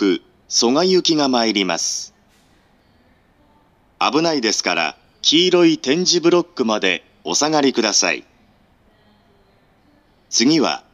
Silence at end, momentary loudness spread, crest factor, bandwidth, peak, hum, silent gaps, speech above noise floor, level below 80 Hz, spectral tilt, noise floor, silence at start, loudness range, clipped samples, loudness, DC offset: 0.15 s; 7 LU; 18 dB; 12.5 kHz; 0 dBFS; none; none; 39 dB; -64 dBFS; -2.5 dB/octave; -56 dBFS; 0 s; 6 LU; under 0.1%; -17 LUFS; under 0.1%